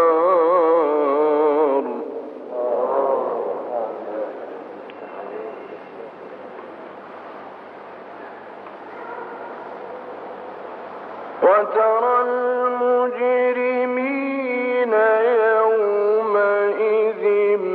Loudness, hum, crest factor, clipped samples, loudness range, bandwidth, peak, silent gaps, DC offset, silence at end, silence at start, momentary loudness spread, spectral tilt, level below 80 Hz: -19 LUFS; none; 16 dB; under 0.1%; 17 LU; 4.8 kHz; -6 dBFS; none; under 0.1%; 0 s; 0 s; 20 LU; -7.5 dB/octave; -84 dBFS